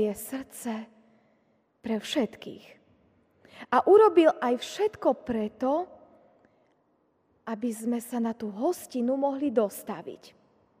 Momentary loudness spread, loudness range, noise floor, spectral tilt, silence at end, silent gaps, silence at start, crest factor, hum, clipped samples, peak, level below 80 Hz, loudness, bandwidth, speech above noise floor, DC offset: 22 LU; 9 LU; -69 dBFS; -5 dB/octave; 0.65 s; none; 0 s; 20 dB; none; under 0.1%; -8 dBFS; -68 dBFS; -27 LUFS; 15.5 kHz; 43 dB; under 0.1%